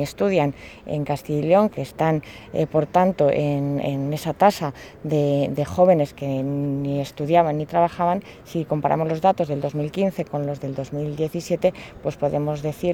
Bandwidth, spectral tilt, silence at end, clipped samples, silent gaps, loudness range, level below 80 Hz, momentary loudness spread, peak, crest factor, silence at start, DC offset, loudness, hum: 18 kHz; -7.5 dB/octave; 0 s; under 0.1%; none; 3 LU; -52 dBFS; 10 LU; -4 dBFS; 18 dB; 0 s; under 0.1%; -22 LUFS; none